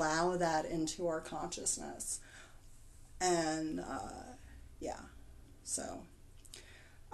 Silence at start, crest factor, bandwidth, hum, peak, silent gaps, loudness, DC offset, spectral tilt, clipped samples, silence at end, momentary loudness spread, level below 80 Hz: 0 s; 20 dB; 12.5 kHz; none; -20 dBFS; none; -38 LUFS; under 0.1%; -3.5 dB/octave; under 0.1%; 0 s; 23 LU; -56 dBFS